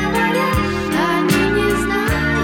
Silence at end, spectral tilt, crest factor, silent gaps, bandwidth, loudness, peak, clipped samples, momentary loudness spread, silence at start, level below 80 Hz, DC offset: 0 s; -5 dB/octave; 14 dB; none; 19.5 kHz; -17 LUFS; -2 dBFS; under 0.1%; 3 LU; 0 s; -32 dBFS; under 0.1%